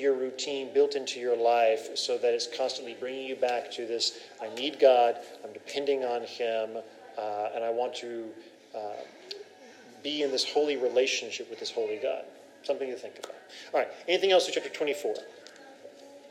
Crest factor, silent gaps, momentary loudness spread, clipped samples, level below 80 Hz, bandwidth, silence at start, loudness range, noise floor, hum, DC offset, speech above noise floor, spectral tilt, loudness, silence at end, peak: 22 dB; none; 19 LU; under 0.1%; under -90 dBFS; 15 kHz; 0 s; 6 LU; -52 dBFS; none; under 0.1%; 22 dB; -2 dB/octave; -29 LUFS; 0 s; -8 dBFS